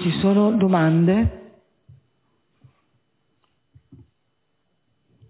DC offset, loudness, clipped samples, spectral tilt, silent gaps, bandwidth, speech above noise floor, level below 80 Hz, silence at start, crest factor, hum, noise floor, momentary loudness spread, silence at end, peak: under 0.1%; -18 LUFS; under 0.1%; -12 dB/octave; none; 4 kHz; 55 dB; -42 dBFS; 0 s; 18 dB; none; -73 dBFS; 4 LU; 3.9 s; -6 dBFS